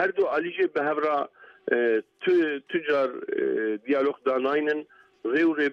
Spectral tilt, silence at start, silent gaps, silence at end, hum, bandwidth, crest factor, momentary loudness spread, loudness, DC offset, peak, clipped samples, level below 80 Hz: -6.5 dB/octave; 0 s; none; 0 s; none; 6.4 kHz; 16 dB; 6 LU; -26 LUFS; under 0.1%; -10 dBFS; under 0.1%; -74 dBFS